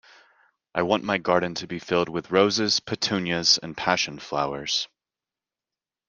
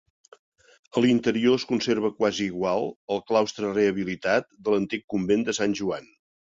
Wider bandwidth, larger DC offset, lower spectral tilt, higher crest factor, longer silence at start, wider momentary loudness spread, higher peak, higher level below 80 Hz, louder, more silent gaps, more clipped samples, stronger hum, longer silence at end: first, 10.5 kHz vs 7.8 kHz; neither; second, -3 dB/octave vs -5 dB/octave; first, 24 dB vs 18 dB; second, 0.75 s vs 0.95 s; about the same, 8 LU vs 7 LU; first, -2 dBFS vs -8 dBFS; about the same, -62 dBFS vs -62 dBFS; about the same, -24 LUFS vs -25 LUFS; second, none vs 2.96-3.08 s, 5.04-5.08 s; neither; neither; first, 1.2 s vs 0.5 s